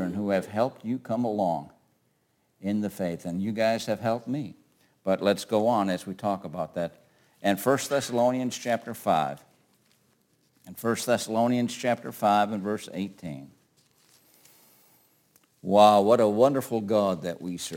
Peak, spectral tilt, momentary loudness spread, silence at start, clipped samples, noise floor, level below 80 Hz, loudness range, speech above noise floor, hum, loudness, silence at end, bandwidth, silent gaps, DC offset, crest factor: -6 dBFS; -5.5 dB/octave; 13 LU; 0 s; under 0.1%; -71 dBFS; -70 dBFS; 7 LU; 45 dB; none; -26 LUFS; 0 s; 17 kHz; none; under 0.1%; 22 dB